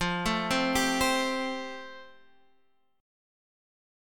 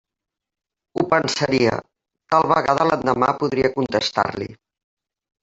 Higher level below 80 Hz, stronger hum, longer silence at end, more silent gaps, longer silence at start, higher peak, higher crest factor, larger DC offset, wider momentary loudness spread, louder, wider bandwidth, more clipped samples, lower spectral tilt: about the same, -50 dBFS vs -54 dBFS; neither; about the same, 1 s vs 0.9 s; neither; second, 0 s vs 0.95 s; second, -12 dBFS vs -2 dBFS; about the same, 20 dB vs 20 dB; neither; first, 15 LU vs 10 LU; second, -28 LUFS vs -20 LUFS; first, 17.5 kHz vs 8 kHz; neither; second, -3.5 dB/octave vs -5 dB/octave